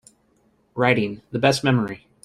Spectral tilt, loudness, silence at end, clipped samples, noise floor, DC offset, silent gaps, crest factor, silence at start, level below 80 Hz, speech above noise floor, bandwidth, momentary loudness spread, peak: -5.5 dB/octave; -21 LUFS; 0.25 s; under 0.1%; -63 dBFS; under 0.1%; none; 20 dB; 0.75 s; -56 dBFS; 42 dB; 13 kHz; 10 LU; -2 dBFS